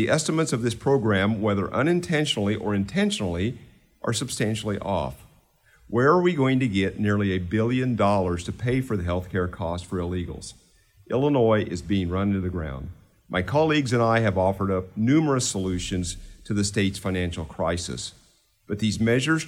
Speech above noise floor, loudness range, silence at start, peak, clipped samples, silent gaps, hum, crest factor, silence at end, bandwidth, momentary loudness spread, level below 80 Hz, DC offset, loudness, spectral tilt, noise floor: 37 dB; 4 LU; 0 s; -8 dBFS; under 0.1%; none; none; 18 dB; 0 s; 15 kHz; 10 LU; -48 dBFS; under 0.1%; -24 LUFS; -5.5 dB/octave; -61 dBFS